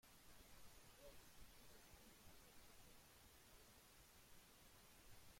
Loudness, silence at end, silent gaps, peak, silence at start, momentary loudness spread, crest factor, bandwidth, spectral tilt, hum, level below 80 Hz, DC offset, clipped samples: -67 LUFS; 0 s; none; -50 dBFS; 0.05 s; 2 LU; 14 dB; 16.5 kHz; -2.5 dB/octave; none; -74 dBFS; under 0.1%; under 0.1%